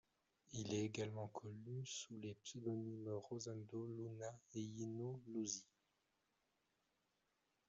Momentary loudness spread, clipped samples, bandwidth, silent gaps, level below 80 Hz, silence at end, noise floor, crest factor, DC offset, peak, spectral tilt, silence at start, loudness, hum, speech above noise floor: 7 LU; under 0.1%; 8 kHz; none; -84 dBFS; 2.05 s; -86 dBFS; 20 dB; under 0.1%; -30 dBFS; -6 dB/octave; 0.5 s; -49 LUFS; none; 38 dB